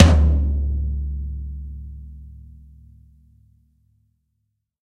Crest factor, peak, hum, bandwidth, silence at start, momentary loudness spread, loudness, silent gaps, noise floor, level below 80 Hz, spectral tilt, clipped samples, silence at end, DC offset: 22 dB; 0 dBFS; none; 8.4 kHz; 0 s; 24 LU; -22 LUFS; none; -74 dBFS; -24 dBFS; -7 dB/octave; under 0.1%; 2.5 s; under 0.1%